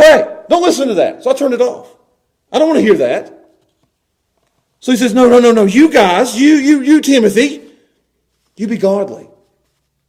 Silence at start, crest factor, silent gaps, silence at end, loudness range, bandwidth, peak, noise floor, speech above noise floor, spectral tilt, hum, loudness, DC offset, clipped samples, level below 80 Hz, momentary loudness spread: 0 s; 12 dB; none; 0.9 s; 7 LU; 15.5 kHz; 0 dBFS; -67 dBFS; 57 dB; -4.5 dB/octave; none; -11 LUFS; under 0.1%; under 0.1%; -50 dBFS; 12 LU